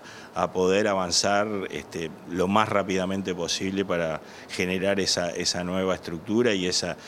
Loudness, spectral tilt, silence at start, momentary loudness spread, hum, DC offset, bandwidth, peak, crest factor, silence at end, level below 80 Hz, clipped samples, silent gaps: -25 LUFS; -3.5 dB/octave; 0 s; 10 LU; none; under 0.1%; 15.5 kHz; -4 dBFS; 22 dB; 0 s; -62 dBFS; under 0.1%; none